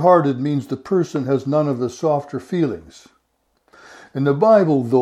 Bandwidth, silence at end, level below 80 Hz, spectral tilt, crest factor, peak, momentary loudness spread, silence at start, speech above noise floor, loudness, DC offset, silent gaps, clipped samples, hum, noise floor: 11.5 kHz; 0 s; -62 dBFS; -8 dB/octave; 18 dB; -2 dBFS; 10 LU; 0 s; 50 dB; -19 LUFS; under 0.1%; none; under 0.1%; none; -67 dBFS